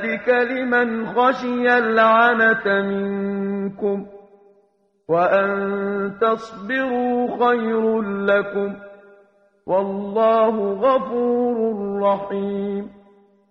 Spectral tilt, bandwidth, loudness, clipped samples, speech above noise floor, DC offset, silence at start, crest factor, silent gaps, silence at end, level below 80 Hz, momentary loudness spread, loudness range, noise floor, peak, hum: -7.5 dB/octave; 6.8 kHz; -20 LUFS; under 0.1%; 42 dB; under 0.1%; 0 s; 18 dB; none; 0.6 s; -62 dBFS; 9 LU; 5 LU; -62 dBFS; -2 dBFS; none